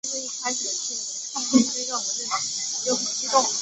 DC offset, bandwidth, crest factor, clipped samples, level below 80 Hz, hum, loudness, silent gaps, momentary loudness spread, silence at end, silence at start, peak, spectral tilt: under 0.1%; 8.4 kHz; 22 dB; under 0.1%; -70 dBFS; none; -24 LUFS; none; 7 LU; 0 s; 0.05 s; -4 dBFS; -1 dB/octave